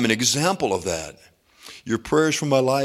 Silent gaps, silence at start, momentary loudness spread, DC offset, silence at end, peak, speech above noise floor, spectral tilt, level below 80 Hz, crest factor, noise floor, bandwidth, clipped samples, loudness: none; 0 s; 18 LU; under 0.1%; 0 s; -4 dBFS; 24 dB; -3.5 dB/octave; -54 dBFS; 18 dB; -46 dBFS; 16 kHz; under 0.1%; -21 LUFS